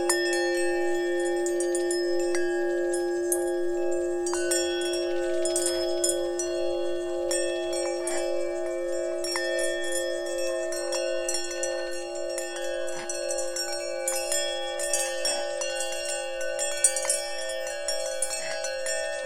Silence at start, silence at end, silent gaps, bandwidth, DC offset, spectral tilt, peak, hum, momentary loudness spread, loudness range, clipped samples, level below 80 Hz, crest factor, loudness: 0 s; 0 s; none; 16.5 kHz; under 0.1%; -1 dB/octave; -8 dBFS; none; 5 LU; 3 LU; under 0.1%; -58 dBFS; 20 dB; -28 LUFS